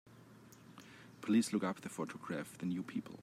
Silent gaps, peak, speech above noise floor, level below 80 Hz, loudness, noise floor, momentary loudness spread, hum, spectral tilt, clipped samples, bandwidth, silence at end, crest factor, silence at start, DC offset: none; -22 dBFS; 21 dB; -82 dBFS; -39 LUFS; -59 dBFS; 25 LU; none; -5.5 dB/octave; under 0.1%; 15 kHz; 0 s; 18 dB; 0.05 s; under 0.1%